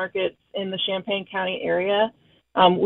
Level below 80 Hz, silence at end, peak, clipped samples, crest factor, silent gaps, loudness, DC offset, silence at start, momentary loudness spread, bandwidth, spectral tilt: -64 dBFS; 0 s; -4 dBFS; under 0.1%; 18 dB; none; -24 LUFS; under 0.1%; 0 s; 10 LU; 4.2 kHz; -8.5 dB/octave